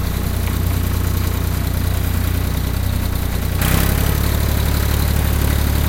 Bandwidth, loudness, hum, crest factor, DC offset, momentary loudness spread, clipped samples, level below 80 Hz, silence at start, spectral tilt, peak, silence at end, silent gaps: 17.5 kHz; -19 LUFS; none; 16 dB; under 0.1%; 4 LU; under 0.1%; -20 dBFS; 0 s; -5 dB/octave; -2 dBFS; 0 s; none